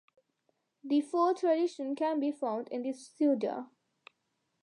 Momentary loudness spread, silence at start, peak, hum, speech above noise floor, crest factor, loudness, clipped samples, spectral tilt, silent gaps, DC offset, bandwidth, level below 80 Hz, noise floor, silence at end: 11 LU; 0.85 s; -18 dBFS; none; 50 dB; 16 dB; -32 LUFS; under 0.1%; -5.5 dB/octave; none; under 0.1%; 11 kHz; under -90 dBFS; -81 dBFS; 1 s